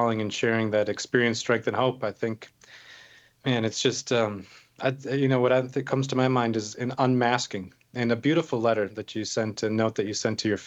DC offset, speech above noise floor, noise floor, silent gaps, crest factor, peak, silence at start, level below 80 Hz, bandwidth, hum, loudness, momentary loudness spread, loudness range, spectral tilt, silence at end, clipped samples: under 0.1%; 27 dB; -53 dBFS; none; 20 dB; -6 dBFS; 0 s; -70 dBFS; 8.4 kHz; none; -26 LUFS; 9 LU; 3 LU; -5 dB/octave; 0 s; under 0.1%